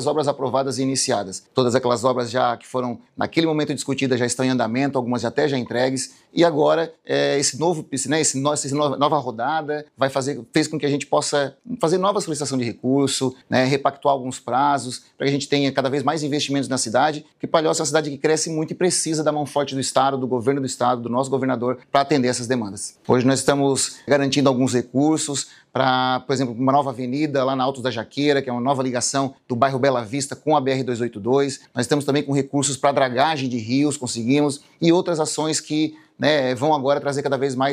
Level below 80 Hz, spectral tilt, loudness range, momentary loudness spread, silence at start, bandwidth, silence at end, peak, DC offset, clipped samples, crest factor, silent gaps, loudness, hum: -66 dBFS; -4.5 dB/octave; 2 LU; 6 LU; 0 s; 15 kHz; 0 s; -2 dBFS; under 0.1%; under 0.1%; 18 dB; none; -21 LUFS; none